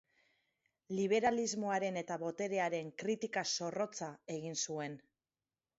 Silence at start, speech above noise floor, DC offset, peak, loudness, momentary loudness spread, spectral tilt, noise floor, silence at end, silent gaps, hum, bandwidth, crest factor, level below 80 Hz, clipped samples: 0.9 s; over 53 dB; under 0.1%; -20 dBFS; -37 LUFS; 11 LU; -3.5 dB/octave; under -90 dBFS; 0.8 s; none; none; 7.6 kHz; 18 dB; -80 dBFS; under 0.1%